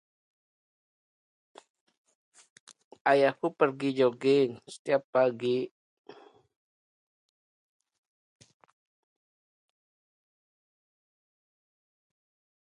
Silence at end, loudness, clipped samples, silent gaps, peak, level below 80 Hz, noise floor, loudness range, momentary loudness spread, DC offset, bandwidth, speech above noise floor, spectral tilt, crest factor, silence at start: 7.05 s; -27 LUFS; under 0.1%; 4.79-4.85 s, 5.04-5.13 s; -10 dBFS; -84 dBFS; -54 dBFS; 8 LU; 8 LU; under 0.1%; 11 kHz; 27 dB; -6 dB/octave; 24 dB; 3.05 s